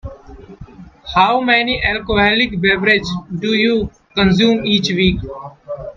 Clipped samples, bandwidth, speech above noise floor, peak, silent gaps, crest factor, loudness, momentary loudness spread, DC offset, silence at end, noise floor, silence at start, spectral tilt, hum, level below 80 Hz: under 0.1%; 7.4 kHz; 23 dB; 0 dBFS; none; 16 dB; -15 LUFS; 17 LU; under 0.1%; 0.05 s; -38 dBFS; 0.05 s; -5.5 dB/octave; none; -36 dBFS